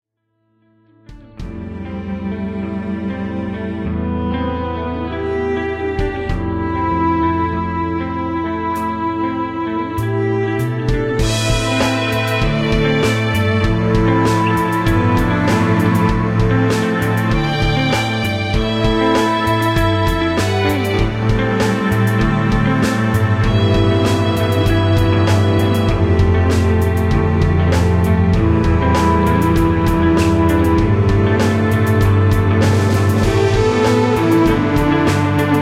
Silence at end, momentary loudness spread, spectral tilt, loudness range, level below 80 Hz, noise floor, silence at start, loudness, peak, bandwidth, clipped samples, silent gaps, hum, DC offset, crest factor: 0 s; 7 LU; -6.5 dB/octave; 7 LU; -26 dBFS; -66 dBFS; 1.1 s; -16 LUFS; -2 dBFS; 15.5 kHz; under 0.1%; none; none; under 0.1%; 12 dB